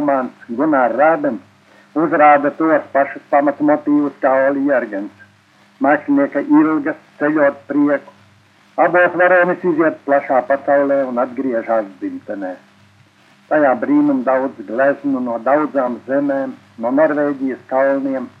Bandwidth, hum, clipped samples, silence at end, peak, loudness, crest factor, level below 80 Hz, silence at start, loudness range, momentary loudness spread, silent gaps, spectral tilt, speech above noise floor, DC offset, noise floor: 5 kHz; none; under 0.1%; 0.1 s; 0 dBFS; -16 LUFS; 16 dB; -76 dBFS; 0 s; 3 LU; 12 LU; none; -8.5 dB/octave; 35 dB; under 0.1%; -51 dBFS